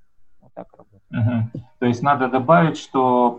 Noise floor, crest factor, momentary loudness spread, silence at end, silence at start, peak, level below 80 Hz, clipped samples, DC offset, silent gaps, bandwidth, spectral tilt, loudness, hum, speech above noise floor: -50 dBFS; 16 dB; 9 LU; 0 s; 0.2 s; -4 dBFS; -58 dBFS; under 0.1%; under 0.1%; none; 8.4 kHz; -7.5 dB/octave; -19 LUFS; none; 33 dB